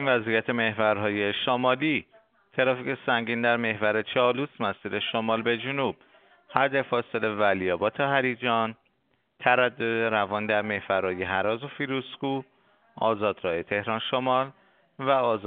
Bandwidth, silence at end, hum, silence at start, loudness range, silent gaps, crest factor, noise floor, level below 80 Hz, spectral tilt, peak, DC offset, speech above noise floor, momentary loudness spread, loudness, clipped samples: 4.6 kHz; 0 s; none; 0 s; 3 LU; none; 24 dB; -72 dBFS; -68 dBFS; -2.5 dB/octave; -4 dBFS; under 0.1%; 46 dB; 7 LU; -26 LUFS; under 0.1%